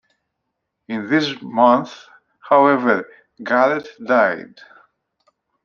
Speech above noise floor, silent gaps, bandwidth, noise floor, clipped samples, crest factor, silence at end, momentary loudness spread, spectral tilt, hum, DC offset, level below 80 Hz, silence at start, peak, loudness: 60 dB; none; 7.2 kHz; -77 dBFS; under 0.1%; 18 dB; 1.2 s; 15 LU; -6 dB/octave; none; under 0.1%; -70 dBFS; 0.9 s; -2 dBFS; -17 LUFS